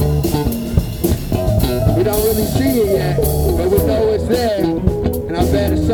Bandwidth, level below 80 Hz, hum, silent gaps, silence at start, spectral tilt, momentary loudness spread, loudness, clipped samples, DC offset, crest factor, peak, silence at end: over 20 kHz; -24 dBFS; none; none; 0 s; -6.5 dB/octave; 4 LU; -16 LUFS; under 0.1%; under 0.1%; 16 dB; 0 dBFS; 0 s